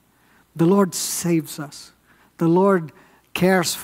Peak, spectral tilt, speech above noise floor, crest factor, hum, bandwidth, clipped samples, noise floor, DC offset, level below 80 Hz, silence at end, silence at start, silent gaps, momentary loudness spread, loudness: -4 dBFS; -5 dB/octave; 38 dB; 18 dB; none; 16 kHz; under 0.1%; -57 dBFS; under 0.1%; -60 dBFS; 0 s; 0.55 s; none; 17 LU; -20 LUFS